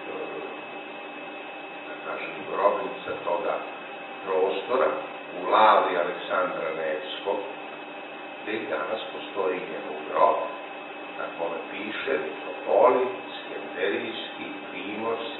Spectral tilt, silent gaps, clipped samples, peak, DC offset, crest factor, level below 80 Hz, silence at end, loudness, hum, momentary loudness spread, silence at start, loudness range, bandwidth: -8 dB/octave; none; under 0.1%; -6 dBFS; under 0.1%; 22 dB; -78 dBFS; 0 s; -28 LUFS; none; 16 LU; 0 s; 6 LU; 4.2 kHz